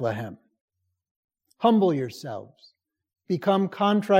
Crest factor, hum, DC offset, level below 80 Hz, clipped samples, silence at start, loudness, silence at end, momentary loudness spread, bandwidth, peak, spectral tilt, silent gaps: 18 dB; none; under 0.1%; -76 dBFS; under 0.1%; 0 s; -24 LUFS; 0 s; 16 LU; 15 kHz; -6 dBFS; -7 dB/octave; 0.61-0.68 s, 1.11-1.28 s